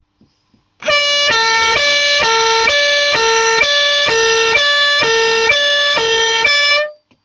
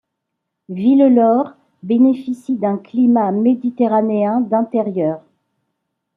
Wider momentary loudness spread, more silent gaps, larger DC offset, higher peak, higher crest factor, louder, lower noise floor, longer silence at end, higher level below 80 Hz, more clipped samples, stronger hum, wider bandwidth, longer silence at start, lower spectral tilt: second, 2 LU vs 11 LU; neither; neither; about the same, -2 dBFS vs -2 dBFS; about the same, 12 dB vs 14 dB; first, -11 LUFS vs -16 LUFS; second, -58 dBFS vs -77 dBFS; second, 0.3 s vs 1 s; first, -48 dBFS vs -68 dBFS; neither; neither; first, 10 kHz vs 3.9 kHz; about the same, 0.8 s vs 0.7 s; second, 0.5 dB/octave vs -9.5 dB/octave